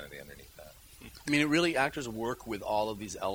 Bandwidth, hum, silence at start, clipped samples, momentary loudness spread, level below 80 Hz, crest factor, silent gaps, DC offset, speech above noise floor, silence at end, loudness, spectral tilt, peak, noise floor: over 20 kHz; none; 0 s; under 0.1%; 24 LU; -58 dBFS; 20 dB; none; under 0.1%; 22 dB; 0 s; -31 LUFS; -4.5 dB/octave; -12 dBFS; -53 dBFS